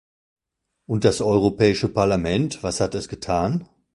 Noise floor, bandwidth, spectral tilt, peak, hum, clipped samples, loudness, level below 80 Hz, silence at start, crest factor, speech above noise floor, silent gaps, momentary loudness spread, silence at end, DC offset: -79 dBFS; 11.5 kHz; -6 dB/octave; -2 dBFS; none; under 0.1%; -22 LUFS; -44 dBFS; 0.9 s; 20 dB; 58 dB; none; 7 LU; 0.3 s; under 0.1%